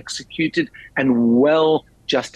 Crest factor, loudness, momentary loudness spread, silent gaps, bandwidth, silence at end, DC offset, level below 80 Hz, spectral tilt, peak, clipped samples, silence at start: 12 dB; -19 LUFS; 9 LU; none; 10 kHz; 0.1 s; under 0.1%; -56 dBFS; -5 dB/octave; -6 dBFS; under 0.1%; 0.05 s